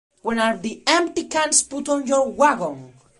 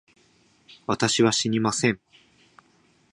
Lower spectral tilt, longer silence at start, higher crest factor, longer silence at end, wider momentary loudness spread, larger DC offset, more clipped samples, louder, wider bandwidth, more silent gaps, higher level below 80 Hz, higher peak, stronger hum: second, -2 dB/octave vs -3.5 dB/octave; second, 0.25 s vs 0.9 s; about the same, 20 dB vs 22 dB; second, 0.3 s vs 1.15 s; second, 9 LU vs 13 LU; neither; neither; first, -20 LUFS vs -23 LUFS; about the same, 11.5 kHz vs 11.5 kHz; neither; about the same, -60 dBFS vs -62 dBFS; first, 0 dBFS vs -6 dBFS; neither